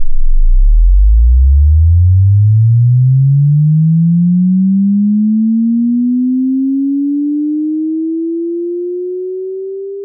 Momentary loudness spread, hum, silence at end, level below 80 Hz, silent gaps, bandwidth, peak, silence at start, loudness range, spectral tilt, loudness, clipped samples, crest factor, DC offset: 10 LU; none; 0 s; -14 dBFS; none; 0.5 kHz; -2 dBFS; 0 s; 6 LU; -26 dB/octave; -11 LUFS; under 0.1%; 8 dB; under 0.1%